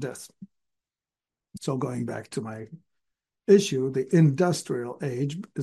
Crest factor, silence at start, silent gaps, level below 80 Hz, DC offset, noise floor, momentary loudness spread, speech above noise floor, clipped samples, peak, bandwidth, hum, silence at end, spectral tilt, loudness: 20 dB; 0 s; none; -70 dBFS; under 0.1%; under -90 dBFS; 18 LU; over 65 dB; under 0.1%; -6 dBFS; 12.5 kHz; none; 0 s; -6.5 dB/octave; -26 LUFS